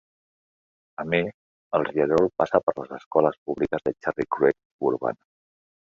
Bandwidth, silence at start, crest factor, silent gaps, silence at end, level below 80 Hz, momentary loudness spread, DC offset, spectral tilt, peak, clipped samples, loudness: 7.4 kHz; 1 s; 22 dB; 1.34-1.71 s, 2.63-2.67 s, 3.06-3.11 s, 3.38-3.46 s, 4.65-4.79 s; 0.7 s; -58 dBFS; 11 LU; under 0.1%; -7.5 dB/octave; -4 dBFS; under 0.1%; -25 LUFS